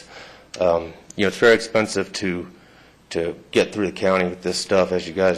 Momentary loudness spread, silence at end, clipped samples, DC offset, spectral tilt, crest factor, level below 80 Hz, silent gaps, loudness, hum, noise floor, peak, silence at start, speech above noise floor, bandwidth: 16 LU; 0 s; under 0.1%; under 0.1%; -4.5 dB/octave; 16 dB; -50 dBFS; none; -21 LUFS; none; -50 dBFS; -4 dBFS; 0.1 s; 30 dB; 14 kHz